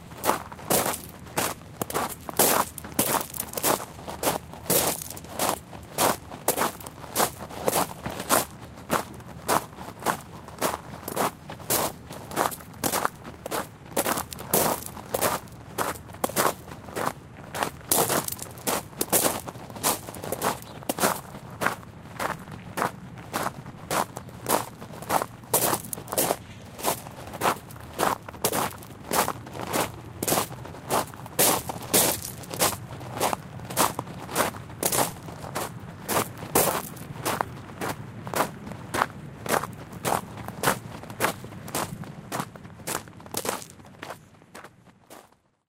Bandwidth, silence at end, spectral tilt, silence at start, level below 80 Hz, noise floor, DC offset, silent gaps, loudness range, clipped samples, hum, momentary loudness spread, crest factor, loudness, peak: 16.5 kHz; 0.45 s; -2.5 dB/octave; 0 s; -54 dBFS; -57 dBFS; under 0.1%; none; 5 LU; under 0.1%; none; 14 LU; 28 dB; -27 LUFS; -2 dBFS